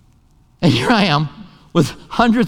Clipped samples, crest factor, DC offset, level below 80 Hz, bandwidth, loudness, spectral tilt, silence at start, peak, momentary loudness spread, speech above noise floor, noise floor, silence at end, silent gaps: under 0.1%; 16 dB; under 0.1%; -42 dBFS; 16.5 kHz; -17 LUFS; -6 dB/octave; 0.6 s; 0 dBFS; 7 LU; 37 dB; -52 dBFS; 0 s; none